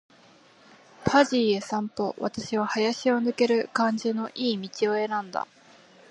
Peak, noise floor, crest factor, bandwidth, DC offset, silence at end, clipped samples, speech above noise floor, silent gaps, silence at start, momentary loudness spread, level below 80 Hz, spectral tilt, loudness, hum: -6 dBFS; -56 dBFS; 20 dB; 11 kHz; under 0.1%; 0.65 s; under 0.1%; 30 dB; none; 1 s; 9 LU; -62 dBFS; -4.5 dB/octave; -26 LUFS; none